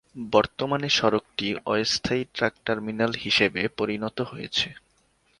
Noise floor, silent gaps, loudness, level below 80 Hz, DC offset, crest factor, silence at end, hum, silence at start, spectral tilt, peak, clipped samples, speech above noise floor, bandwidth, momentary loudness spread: -65 dBFS; none; -25 LUFS; -56 dBFS; under 0.1%; 22 dB; 0.6 s; none; 0.15 s; -4 dB/octave; -4 dBFS; under 0.1%; 40 dB; 11.5 kHz; 8 LU